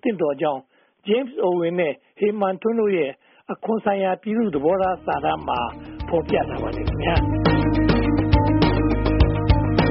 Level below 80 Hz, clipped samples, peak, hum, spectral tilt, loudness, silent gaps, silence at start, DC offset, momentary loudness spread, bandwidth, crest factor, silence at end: -30 dBFS; under 0.1%; -4 dBFS; none; -6 dB/octave; -21 LUFS; none; 0.05 s; under 0.1%; 7 LU; 5.8 kHz; 16 dB; 0 s